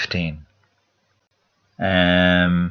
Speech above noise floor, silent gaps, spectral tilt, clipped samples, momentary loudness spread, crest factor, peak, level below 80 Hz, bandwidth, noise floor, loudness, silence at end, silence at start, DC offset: 50 dB; none; -7 dB/octave; under 0.1%; 13 LU; 18 dB; -2 dBFS; -46 dBFS; 6.4 kHz; -68 dBFS; -18 LUFS; 0 s; 0 s; under 0.1%